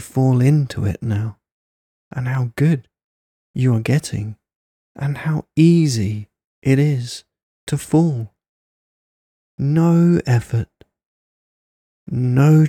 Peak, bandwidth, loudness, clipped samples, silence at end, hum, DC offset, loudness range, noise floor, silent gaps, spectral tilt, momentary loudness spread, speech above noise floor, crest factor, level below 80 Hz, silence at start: -2 dBFS; 13.5 kHz; -18 LUFS; under 0.1%; 0 s; none; under 0.1%; 4 LU; under -90 dBFS; 1.52-2.11 s, 3.04-3.54 s, 4.55-4.95 s, 6.44-6.62 s, 7.43-7.67 s, 8.48-9.58 s, 11.06-12.06 s; -7.5 dB/octave; 16 LU; over 74 dB; 16 dB; -52 dBFS; 0 s